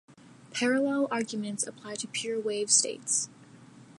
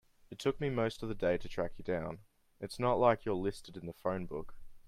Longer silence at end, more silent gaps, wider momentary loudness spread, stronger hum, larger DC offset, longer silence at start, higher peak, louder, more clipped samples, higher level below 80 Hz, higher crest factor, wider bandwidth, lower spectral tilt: about the same, 0.05 s vs 0.05 s; neither; second, 11 LU vs 17 LU; neither; neither; second, 0.1 s vs 0.3 s; first, -10 dBFS vs -14 dBFS; first, -28 LUFS vs -35 LUFS; neither; second, -80 dBFS vs -54 dBFS; about the same, 22 dB vs 22 dB; second, 11.5 kHz vs 14.5 kHz; second, -2 dB/octave vs -6.5 dB/octave